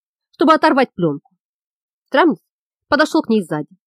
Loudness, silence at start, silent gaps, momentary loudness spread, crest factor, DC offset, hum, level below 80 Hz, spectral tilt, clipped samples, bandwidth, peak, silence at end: -16 LUFS; 0.4 s; 1.40-2.05 s, 2.50-2.71 s; 11 LU; 16 dB; under 0.1%; none; -58 dBFS; -5.5 dB/octave; under 0.1%; 13 kHz; -2 dBFS; 0.2 s